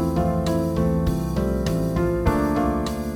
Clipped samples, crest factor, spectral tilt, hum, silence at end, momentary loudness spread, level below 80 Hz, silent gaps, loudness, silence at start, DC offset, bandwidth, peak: under 0.1%; 14 dB; -7.5 dB/octave; none; 0 s; 2 LU; -30 dBFS; none; -23 LUFS; 0 s; under 0.1%; 17.5 kHz; -8 dBFS